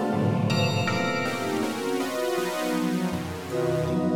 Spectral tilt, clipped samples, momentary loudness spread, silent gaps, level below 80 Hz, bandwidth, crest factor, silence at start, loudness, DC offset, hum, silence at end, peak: -5.5 dB/octave; under 0.1%; 4 LU; none; -62 dBFS; 17.5 kHz; 14 dB; 0 s; -26 LUFS; under 0.1%; none; 0 s; -12 dBFS